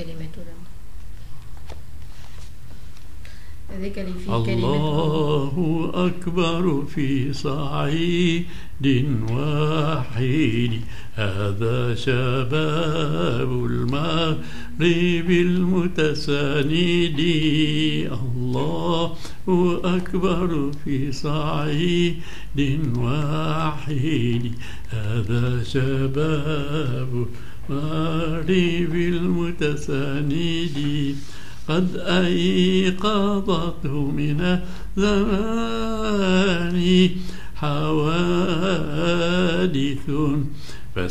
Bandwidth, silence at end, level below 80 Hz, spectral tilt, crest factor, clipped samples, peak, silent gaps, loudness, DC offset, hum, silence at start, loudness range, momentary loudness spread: 14.5 kHz; 0 s; -38 dBFS; -6.5 dB/octave; 16 dB; under 0.1%; -4 dBFS; none; -22 LUFS; 5%; none; 0 s; 4 LU; 13 LU